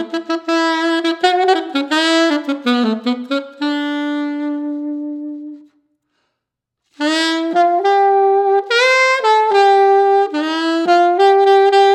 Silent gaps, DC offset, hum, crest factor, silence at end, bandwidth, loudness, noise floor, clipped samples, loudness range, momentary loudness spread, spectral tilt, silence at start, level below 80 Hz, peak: none; under 0.1%; none; 14 dB; 0 s; 10.5 kHz; -14 LUFS; -79 dBFS; under 0.1%; 11 LU; 11 LU; -3 dB/octave; 0 s; -84 dBFS; 0 dBFS